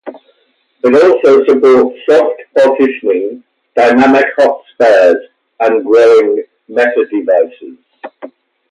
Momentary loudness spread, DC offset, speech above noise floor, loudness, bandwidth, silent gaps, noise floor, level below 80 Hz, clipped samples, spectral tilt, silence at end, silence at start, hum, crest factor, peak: 11 LU; under 0.1%; 48 dB; -10 LUFS; 10.5 kHz; none; -57 dBFS; -58 dBFS; under 0.1%; -5 dB/octave; 0.45 s; 0.05 s; none; 10 dB; 0 dBFS